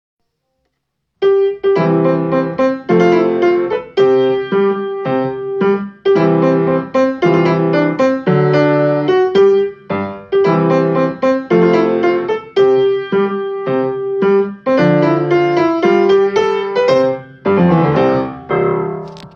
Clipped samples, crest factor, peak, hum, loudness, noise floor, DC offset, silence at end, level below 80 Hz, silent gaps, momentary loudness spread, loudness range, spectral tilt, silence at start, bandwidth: under 0.1%; 14 dB; 0 dBFS; none; -14 LUFS; -71 dBFS; under 0.1%; 0.05 s; -56 dBFS; none; 7 LU; 2 LU; -8 dB/octave; 1.2 s; 7 kHz